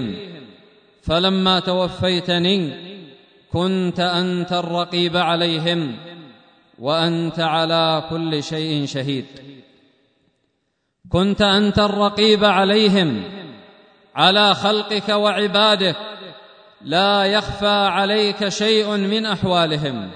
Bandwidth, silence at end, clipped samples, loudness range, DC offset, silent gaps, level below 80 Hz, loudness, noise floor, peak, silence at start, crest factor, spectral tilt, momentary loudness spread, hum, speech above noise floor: 9.6 kHz; 0 s; under 0.1%; 5 LU; under 0.1%; none; -48 dBFS; -18 LUFS; -71 dBFS; 0 dBFS; 0 s; 20 dB; -5 dB/octave; 14 LU; none; 53 dB